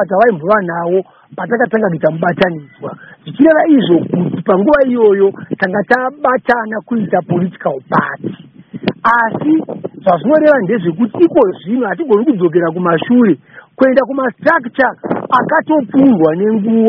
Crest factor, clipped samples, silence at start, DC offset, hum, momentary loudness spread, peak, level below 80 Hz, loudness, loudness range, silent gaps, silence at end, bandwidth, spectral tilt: 12 dB; under 0.1%; 0 s; under 0.1%; none; 11 LU; 0 dBFS; -52 dBFS; -13 LUFS; 4 LU; none; 0 s; 5.8 kHz; -9.5 dB/octave